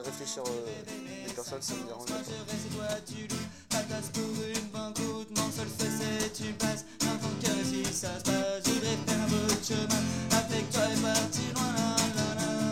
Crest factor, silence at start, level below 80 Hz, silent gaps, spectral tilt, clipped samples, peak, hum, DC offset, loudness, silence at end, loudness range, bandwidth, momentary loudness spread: 20 dB; 0 s; -58 dBFS; none; -3.5 dB/octave; under 0.1%; -12 dBFS; none; 0.1%; -32 LUFS; 0 s; 7 LU; 16.5 kHz; 9 LU